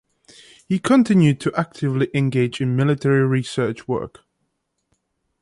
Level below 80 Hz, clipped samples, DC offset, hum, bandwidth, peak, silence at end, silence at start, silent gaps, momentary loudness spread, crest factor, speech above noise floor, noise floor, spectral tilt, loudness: -56 dBFS; under 0.1%; under 0.1%; none; 11.5 kHz; -2 dBFS; 1.35 s; 0.7 s; none; 10 LU; 18 dB; 55 dB; -73 dBFS; -7 dB/octave; -20 LUFS